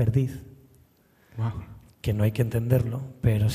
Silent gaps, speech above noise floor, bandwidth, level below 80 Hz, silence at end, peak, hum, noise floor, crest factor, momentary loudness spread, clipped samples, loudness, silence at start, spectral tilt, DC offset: none; 36 dB; 15 kHz; -46 dBFS; 0 s; -8 dBFS; none; -60 dBFS; 18 dB; 17 LU; under 0.1%; -27 LUFS; 0 s; -8 dB/octave; under 0.1%